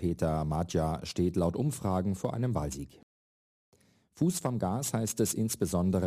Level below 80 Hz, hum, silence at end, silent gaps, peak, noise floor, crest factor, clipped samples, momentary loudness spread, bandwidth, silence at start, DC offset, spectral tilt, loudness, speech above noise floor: -50 dBFS; none; 0 s; 3.03-3.72 s; -16 dBFS; under -90 dBFS; 16 dB; under 0.1%; 4 LU; 15.5 kHz; 0 s; under 0.1%; -6 dB/octave; -31 LUFS; over 60 dB